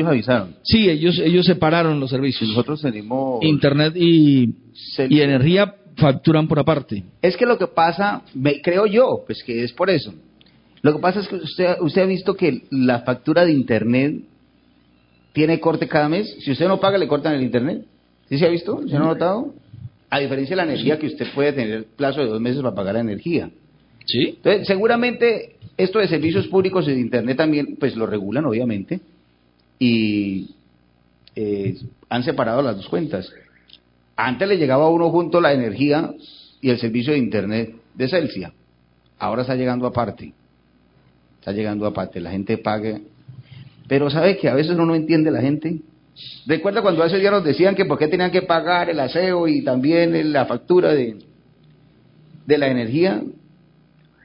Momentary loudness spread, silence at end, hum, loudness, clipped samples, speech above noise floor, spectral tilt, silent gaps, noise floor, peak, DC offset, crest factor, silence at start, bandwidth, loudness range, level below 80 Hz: 11 LU; 0.9 s; none; -19 LUFS; under 0.1%; 40 dB; -11.5 dB/octave; none; -58 dBFS; -2 dBFS; under 0.1%; 18 dB; 0 s; 5.4 kHz; 7 LU; -52 dBFS